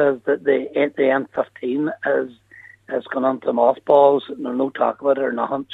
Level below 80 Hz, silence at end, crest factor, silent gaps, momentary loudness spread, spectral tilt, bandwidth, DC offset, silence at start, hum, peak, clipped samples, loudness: -72 dBFS; 0 s; 18 dB; none; 11 LU; -8 dB/octave; 4.1 kHz; under 0.1%; 0 s; none; -2 dBFS; under 0.1%; -20 LUFS